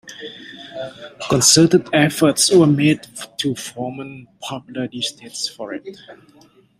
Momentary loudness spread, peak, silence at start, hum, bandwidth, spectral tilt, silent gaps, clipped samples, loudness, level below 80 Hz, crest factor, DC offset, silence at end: 21 LU; 0 dBFS; 0.05 s; none; 16 kHz; -4 dB/octave; none; under 0.1%; -16 LUFS; -56 dBFS; 20 dB; under 0.1%; 0.65 s